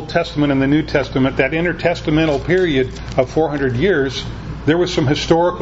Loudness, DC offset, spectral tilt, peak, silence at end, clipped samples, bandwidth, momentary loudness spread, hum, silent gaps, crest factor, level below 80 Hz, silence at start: -17 LUFS; under 0.1%; -6.5 dB/octave; 0 dBFS; 0 s; under 0.1%; 8 kHz; 5 LU; none; none; 16 dB; -34 dBFS; 0 s